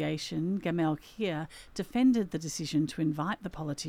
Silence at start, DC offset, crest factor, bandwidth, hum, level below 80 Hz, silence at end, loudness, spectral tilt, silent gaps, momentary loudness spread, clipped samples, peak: 0 s; under 0.1%; 14 dB; 15.5 kHz; none; -58 dBFS; 0 s; -32 LUFS; -5.5 dB/octave; none; 11 LU; under 0.1%; -16 dBFS